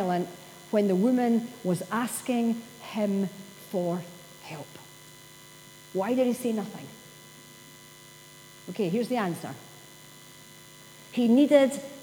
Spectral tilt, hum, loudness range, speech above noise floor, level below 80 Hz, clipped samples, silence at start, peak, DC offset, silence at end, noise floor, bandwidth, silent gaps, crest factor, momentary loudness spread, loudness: -6 dB/octave; 60 Hz at -55 dBFS; 7 LU; 23 dB; -74 dBFS; under 0.1%; 0 s; -8 dBFS; under 0.1%; 0 s; -50 dBFS; over 20 kHz; none; 22 dB; 24 LU; -27 LUFS